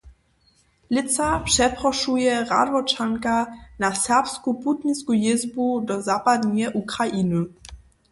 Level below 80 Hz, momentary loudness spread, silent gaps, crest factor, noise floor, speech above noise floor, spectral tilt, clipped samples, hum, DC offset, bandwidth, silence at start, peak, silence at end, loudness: -46 dBFS; 6 LU; none; 16 dB; -62 dBFS; 40 dB; -3.5 dB/octave; under 0.1%; none; under 0.1%; 11.5 kHz; 0.05 s; -6 dBFS; 0.35 s; -22 LUFS